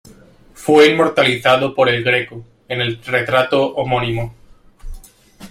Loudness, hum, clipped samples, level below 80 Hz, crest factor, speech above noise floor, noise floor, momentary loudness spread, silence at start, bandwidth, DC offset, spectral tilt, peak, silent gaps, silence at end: -15 LUFS; none; under 0.1%; -40 dBFS; 16 dB; 30 dB; -45 dBFS; 14 LU; 0.6 s; 16 kHz; under 0.1%; -5 dB/octave; 0 dBFS; none; 0.05 s